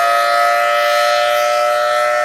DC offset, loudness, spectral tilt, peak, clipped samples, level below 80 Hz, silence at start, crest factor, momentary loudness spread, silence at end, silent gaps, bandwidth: under 0.1%; -13 LUFS; 0.5 dB/octave; -2 dBFS; under 0.1%; -70 dBFS; 0 s; 10 dB; 2 LU; 0 s; none; 16 kHz